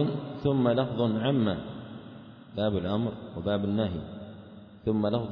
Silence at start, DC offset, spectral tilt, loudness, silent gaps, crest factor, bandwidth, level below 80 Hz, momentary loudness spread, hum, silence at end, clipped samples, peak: 0 s; under 0.1%; -10.5 dB/octave; -29 LUFS; none; 18 dB; 5.4 kHz; -56 dBFS; 18 LU; none; 0 s; under 0.1%; -10 dBFS